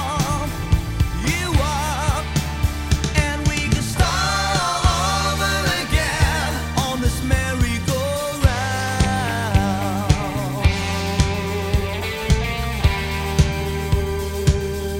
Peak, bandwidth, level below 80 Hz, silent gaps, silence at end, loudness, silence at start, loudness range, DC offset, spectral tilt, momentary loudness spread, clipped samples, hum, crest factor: 0 dBFS; 16.5 kHz; -26 dBFS; none; 0 s; -21 LUFS; 0 s; 2 LU; under 0.1%; -4.5 dB/octave; 4 LU; under 0.1%; none; 20 dB